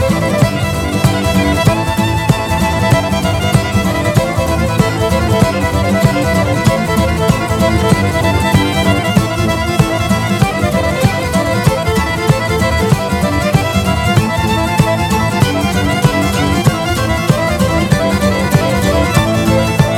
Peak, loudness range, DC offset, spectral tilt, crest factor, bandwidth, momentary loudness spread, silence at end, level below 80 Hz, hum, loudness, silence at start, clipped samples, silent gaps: 0 dBFS; 1 LU; under 0.1%; -5.5 dB/octave; 12 dB; 17.5 kHz; 2 LU; 0 s; -26 dBFS; none; -13 LUFS; 0 s; under 0.1%; none